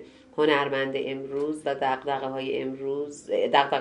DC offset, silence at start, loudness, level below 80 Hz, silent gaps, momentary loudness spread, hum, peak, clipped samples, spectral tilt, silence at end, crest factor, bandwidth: under 0.1%; 0 s; -27 LUFS; -68 dBFS; none; 9 LU; none; -4 dBFS; under 0.1%; -4.5 dB/octave; 0 s; 22 dB; 11.5 kHz